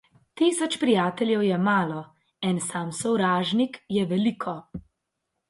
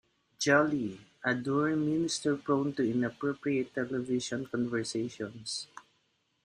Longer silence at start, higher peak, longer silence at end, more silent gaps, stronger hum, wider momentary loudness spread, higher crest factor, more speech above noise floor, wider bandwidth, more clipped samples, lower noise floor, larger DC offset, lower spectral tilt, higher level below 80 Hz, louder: about the same, 0.35 s vs 0.4 s; about the same, -8 dBFS vs -10 dBFS; about the same, 0.7 s vs 0.65 s; neither; neither; about the same, 11 LU vs 11 LU; second, 16 dB vs 22 dB; first, 56 dB vs 44 dB; about the same, 11.5 kHz vs 10.5 kHz; neither; first, -81 dBFS vs -75 dBFS; neither; about the same, -5 dB/octave vs -4.5 dB/octave; first, -62 dBFS vs -70 dBFS; first, -25 LUFS vs -31 LUFS